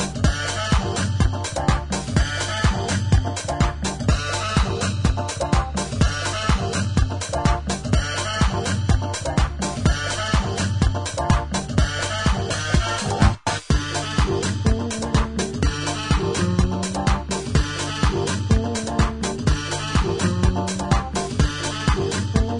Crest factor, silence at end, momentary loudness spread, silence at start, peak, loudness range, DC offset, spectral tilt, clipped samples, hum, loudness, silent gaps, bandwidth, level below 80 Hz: 18 dB; 0 s; 3 LU; 0 s; -4 dBFS; 1 LU; under 0.1%; -5 dB/octave; under 0.1%; none; -22 LUFS; none; 11 kHz; -26 dBFS